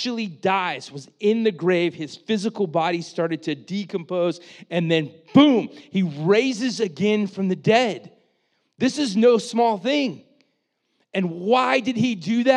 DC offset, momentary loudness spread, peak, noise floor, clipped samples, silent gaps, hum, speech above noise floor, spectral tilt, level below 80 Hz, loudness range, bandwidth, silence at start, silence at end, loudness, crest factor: under 0.1%; 10 LU; -4 dBFS; -72 dBFS; under 0.1%; none; none; 51 dB; -5.5 dB/octave; -74 dBFS; 4 LU; 10.5 kHz; 0 s; 0 s; -22 LUFS; 18 dB